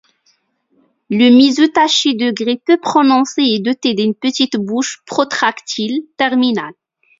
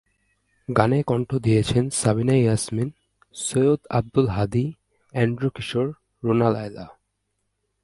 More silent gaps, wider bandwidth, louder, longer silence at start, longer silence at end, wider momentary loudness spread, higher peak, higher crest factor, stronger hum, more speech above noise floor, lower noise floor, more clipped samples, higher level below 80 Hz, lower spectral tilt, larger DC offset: neither; second, 7.8 kHz vs 11.5 kHz; first, -14 LUFS vs -23 LUFS; first, 1.1 s vs 0.7 s; second, 0.45 s vs 0.95 s; about the same, 10 LU vs 11 LU; about the same, 0 dBFS vs 0 dBFS; second, 14 dB vs 22 dB; neither; second, 46 dB vs 54 dB; second, -60 dBFS vs -75 dBFS; neither; second, -64 dBFS vs -48 dBFS; second, -3.5 dB/octave vs -6 dB/octave; neither